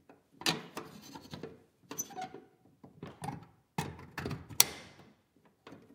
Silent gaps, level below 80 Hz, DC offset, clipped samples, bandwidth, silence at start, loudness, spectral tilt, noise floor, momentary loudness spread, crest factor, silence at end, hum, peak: none; -70 dBFS; under 0.1%; under 0.1%; 16 kHz; 0.1 s; -35 LUFS; -2 dB/octave; -69 dBFS; 24 LU; 40 dB; 0 s; none; 0 dBFS